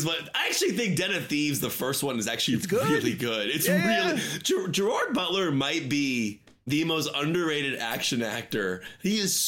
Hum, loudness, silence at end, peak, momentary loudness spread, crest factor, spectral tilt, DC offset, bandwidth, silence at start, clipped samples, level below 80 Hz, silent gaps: none; -26 LUFS; 0 s; -14 dBFS; 6 LU; 14 dB; -3.5 dB/octave; under 0.1%; 17 kHz; 0 s; under 0.1%; -64 dBFS; none